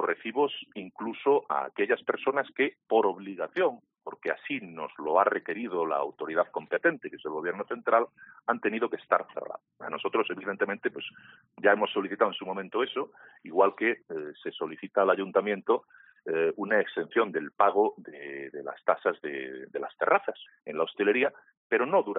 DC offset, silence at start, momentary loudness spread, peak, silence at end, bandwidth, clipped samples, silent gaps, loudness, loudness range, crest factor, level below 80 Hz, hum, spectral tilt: under 0.1%; 0 s; 13 LU; -8 dBFS; 0 s; 4 kHz; under 0.1%; 21.57-21.70 s; -29 LUFS; 2 LU; 22 dB; -82 dBFS; none; -2 dB/octave